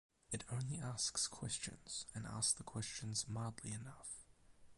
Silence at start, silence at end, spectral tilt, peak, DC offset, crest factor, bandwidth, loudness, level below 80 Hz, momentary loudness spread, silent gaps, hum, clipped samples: 0.3 s; 0.05 s; -3 dB/octave; -22 dBFS; under 0.1%; 22 dB; 11.5 kHz; -43 LUFS; -68 dBFS; 11 LU; none; none; under 0.1%